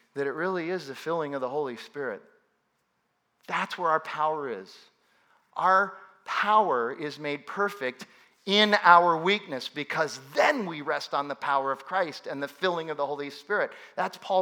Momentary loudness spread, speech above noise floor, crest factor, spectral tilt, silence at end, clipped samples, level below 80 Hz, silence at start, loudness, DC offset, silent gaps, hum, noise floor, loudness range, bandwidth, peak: 13 LU; 48 dB; 26 dB; -4 dB/octave; 0 s; under 0.1%; -90 dBFS; 0.15 s; -27 LUFS; under 0.1%; none; none; -75 dBFS; 9 LU; 19.5 kHz; -2 dBFS